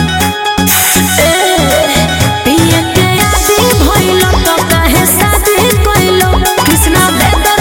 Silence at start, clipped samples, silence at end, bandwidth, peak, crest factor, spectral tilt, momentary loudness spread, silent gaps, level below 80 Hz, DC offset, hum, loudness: 0 s; 0.1%; 0 s; 17.5 kHz; 0 dBFS; 8 dB; -3.5 dB/octave; 2 LU; none; -20 dBFS; under 0.1%; none; -8 LUFS